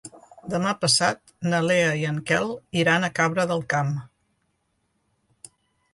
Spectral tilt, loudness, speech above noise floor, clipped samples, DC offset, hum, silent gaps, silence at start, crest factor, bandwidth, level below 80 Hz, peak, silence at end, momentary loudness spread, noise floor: -4 dB/octave; -23 LUFS; 49 dB; under 0.1%; under 0.1%; none; none; 0.05 s; 18 dB; 11.5 kHz; -62 dBFS; -8 dBFS; 1.85 s; 9 LU; -72 dBFS